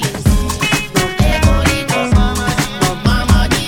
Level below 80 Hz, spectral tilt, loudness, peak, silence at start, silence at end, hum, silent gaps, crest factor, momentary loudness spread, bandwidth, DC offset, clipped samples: -18 dBFS; -4.5 dB/octave; -14 LUFS; 0 dBFS; 0 s; 0 s; none; none; 14 dB; 4 LU; 18 kHz; under 0.1%; under 0.1%